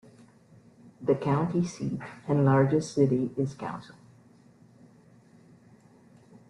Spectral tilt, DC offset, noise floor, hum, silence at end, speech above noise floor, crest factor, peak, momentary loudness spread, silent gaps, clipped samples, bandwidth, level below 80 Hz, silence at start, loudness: -8 dB/octave; under 0.1%; -57 dBFS; none; 2.65 s; 31 dB; 20 dB; -10 dBFS; 14 LU; none; under 0.1%; 10.5 kHz; -64 dBFS; 1 s; -27 LUFS